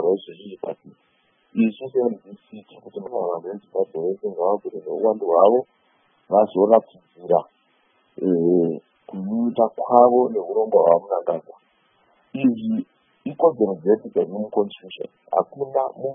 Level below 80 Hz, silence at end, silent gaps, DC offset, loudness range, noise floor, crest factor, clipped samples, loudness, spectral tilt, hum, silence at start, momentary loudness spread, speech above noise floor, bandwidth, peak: -74 dBFS; 0 s; none; under 0.1%; 7 LU; -64 dBFS; 22 dB; under 0.1%; -21 LUFS; -11 dB/octave; none; 0 s; 19 LU; 43 dB; 3.7 kHz; 0 dBFS